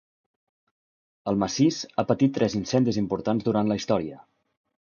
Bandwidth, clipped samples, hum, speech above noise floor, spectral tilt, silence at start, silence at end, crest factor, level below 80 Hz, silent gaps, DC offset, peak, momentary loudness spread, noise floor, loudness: 7.2 kHz; under 0.1%; none; over 66 dB; -6 dB/octave; 1.25 s; 0.7 s; 20 dB; -58 dBFS; none; under 0.1%; -6 dBFS; 6 LU; under -90 dBFS; -25 LUFS